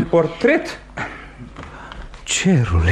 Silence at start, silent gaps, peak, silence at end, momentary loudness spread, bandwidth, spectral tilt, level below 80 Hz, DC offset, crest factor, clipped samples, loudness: 0 s; none; -2 dBFS; 0 s; 20 LU; 12.5 kHz; -5 dB/octave; -32 dBFS; under 0.1%; 16 dB; under 0.1%; -19 LUFS